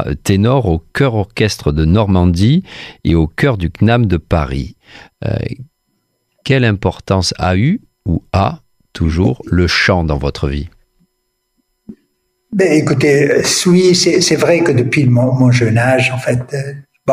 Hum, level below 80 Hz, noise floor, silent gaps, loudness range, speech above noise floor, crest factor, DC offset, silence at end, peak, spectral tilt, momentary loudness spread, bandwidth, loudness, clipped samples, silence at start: none; -30 dBFS; -67 dBFS; none; 7 LU; 55 dB; 12 dB; under 0.1%; 0 s; -2 dBFS; -5.5 dB/octave; 12 LU; 15.5 kHz; -13 LUFS; under 0.1%; 0 s